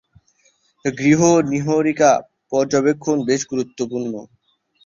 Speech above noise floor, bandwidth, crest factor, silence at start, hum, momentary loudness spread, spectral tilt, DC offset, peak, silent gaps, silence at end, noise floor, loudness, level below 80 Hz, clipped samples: 43 dB; 7.6 kHz; 16 dB; 0.85 s; none; 12 LU; -5.5 dB/octave; under 0.1%; -2 dBFS; none; 0.6 s; -61 dBFS; -18 LUFS; -58 dBFS; under 0.1%